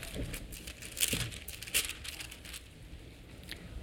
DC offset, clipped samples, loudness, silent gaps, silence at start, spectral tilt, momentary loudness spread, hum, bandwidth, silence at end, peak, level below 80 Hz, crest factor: under 0.1%; under 0.1%; -37 LUFS; none; 0 s; -1.5 dB/octave; 20 LU; none; 19 kHz; 0 s; -8 dBFS; -50 dBFS; 32 dB